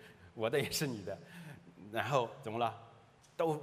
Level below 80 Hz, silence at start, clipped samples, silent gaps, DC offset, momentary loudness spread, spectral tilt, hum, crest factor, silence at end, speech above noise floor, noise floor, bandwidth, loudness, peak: -72 dBFS; 0 s; under 0.1%; none; under 0.1%; 19 LU; -4.5 dB/octave; none; 22 dB; 0 s; 26 dB; -62 dBFS; 15.5 kHz; -37 LUFS; -16 dBFS